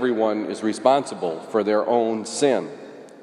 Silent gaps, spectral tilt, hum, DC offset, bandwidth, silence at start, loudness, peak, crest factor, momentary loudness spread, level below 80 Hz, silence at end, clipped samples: none; -4.5 dB/octave; none; under 0.1%; 11.5 kHz; 0 s; -22 LUFS; -4 dBFS; 18 dB; 10 LU; -78 dBFS; 0 s; under 0.1%